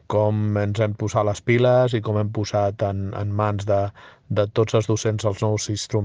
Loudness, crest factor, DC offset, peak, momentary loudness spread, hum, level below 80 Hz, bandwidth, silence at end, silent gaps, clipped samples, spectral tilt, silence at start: -22 LUFS; 16 dB; under 0.1%; -6 dBFS; 6 LU; none; -54 dBFS; 9.6 kHz; 0 s; none; under 0.1%; -6.5 dB/octave; 0.1 s